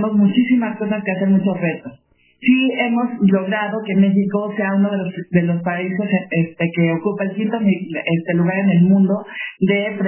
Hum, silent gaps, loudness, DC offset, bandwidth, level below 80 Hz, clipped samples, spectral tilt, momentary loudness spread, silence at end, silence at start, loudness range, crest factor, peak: none; none; -18 LUFS; under 0.1%; 3.2 kHz; -62 dBFS; under 0.1%; -11.5 dB/octave; 6 LU; 0 s; 0 s; 2 LU; 16 dB; -2 dBFS